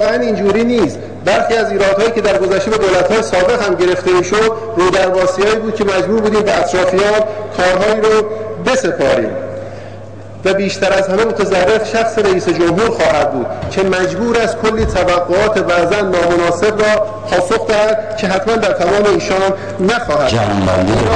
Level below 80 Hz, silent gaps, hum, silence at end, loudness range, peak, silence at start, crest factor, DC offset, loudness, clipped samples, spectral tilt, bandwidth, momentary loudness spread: -36 dBFS; none; none; 0 s; 2 LU; -2 dBFS; 0 s; 10 dB; 1%; -13 LUFS; under 0.1%; -5 dB/octave; 10 kHz; 4 LU